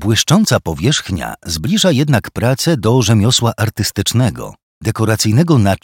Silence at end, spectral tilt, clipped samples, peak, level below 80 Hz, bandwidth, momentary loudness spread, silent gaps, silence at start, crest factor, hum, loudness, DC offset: 0.05 s; -5 dB/octave; under 0.1%; 0 dBFS; -40 dBFS; 17.5 kHz; 10 LU; 4.63-4.81 s; 0 s; 14 dB; none; -14 LUFS; under 0.1%